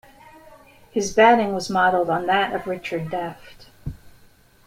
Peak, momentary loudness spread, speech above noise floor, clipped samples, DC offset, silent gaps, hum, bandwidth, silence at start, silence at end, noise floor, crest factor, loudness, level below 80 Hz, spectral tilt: -4 dBFS; 22 LU; 33 dB; under 0.1%; under 0.1%; none; none; 16 kHz; 0.95 s; 0.55 s; -53 dBFS; 20 dB; -20 LUFS; -50 dBFS; -4.5 dB/octave